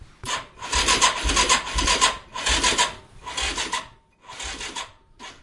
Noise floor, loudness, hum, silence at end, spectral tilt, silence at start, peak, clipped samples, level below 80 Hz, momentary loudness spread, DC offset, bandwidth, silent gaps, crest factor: -46 dBFS; -22 LUFS; none; 0.1 s; -1 dB/octave; 0 s; -4 dBFS; under 0.1%; -36 dBFS; 16 LU; under 0.1%; 11.5 kHz; none; 22 dB